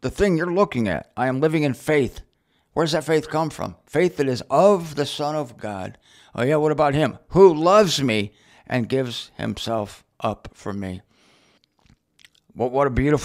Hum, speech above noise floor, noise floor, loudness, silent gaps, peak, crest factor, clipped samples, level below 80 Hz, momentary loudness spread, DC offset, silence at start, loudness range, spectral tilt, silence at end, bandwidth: none; 40 dB; -60 dBFS; -21 LUFS; none; 0 dBFS; 20 dB; under 0.1%; -46 dBFS; 15 LU; under 0.1%; 0.05 s; 10 LU; -6 dB/octave; 0 s; 15.5 kHz